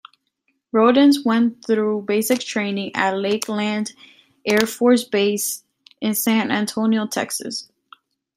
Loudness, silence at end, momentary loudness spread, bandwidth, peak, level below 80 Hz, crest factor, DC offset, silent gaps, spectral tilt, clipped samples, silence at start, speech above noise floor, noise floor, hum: -20 LUFS; 0.7 s; 11 LU; 16 kHz; -2 dBFS; -66 dBFS; 20 dB; under 0.1%; none; -4 dB/octave; under 0.1%; 0.75 s; 52 dB; -71 dBFS; none